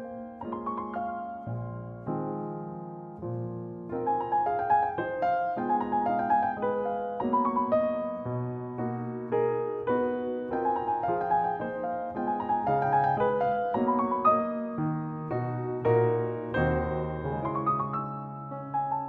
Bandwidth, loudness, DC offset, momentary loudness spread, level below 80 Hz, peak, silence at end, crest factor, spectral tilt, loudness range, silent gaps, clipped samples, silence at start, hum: 5.2 kHz; -29 LUFS; under 0.1%; 11 LU; -54 dBFS; -12 dBFS; 0 s; 18 dB; -10.5 dB/octave; 6 LU; none; under 0.1%; 0 s; none